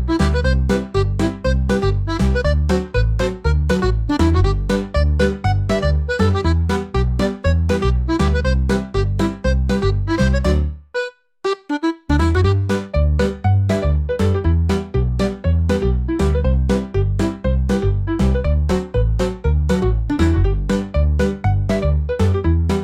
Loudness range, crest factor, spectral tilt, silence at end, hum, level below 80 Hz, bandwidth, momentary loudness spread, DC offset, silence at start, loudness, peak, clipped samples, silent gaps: 1 LU; 12 dB; -7.5 dB/octave; 0 s; none; -22 dBFS; 11 kHz; 4 LU; under 0.1%; 0 s; -18 LUFS; -4 dBFS; under 0.1%; none